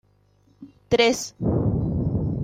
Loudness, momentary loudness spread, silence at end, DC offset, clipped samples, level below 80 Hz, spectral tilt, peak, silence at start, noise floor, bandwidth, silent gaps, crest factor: -23 LUFS; 6 LU; 0 s; under 0.1%; under 0.1%; -40 dBFS; -5.5 dB/octave; -6 dBFS; 0.6 s; -60 dBFS; 16 kHz; none; 18 dB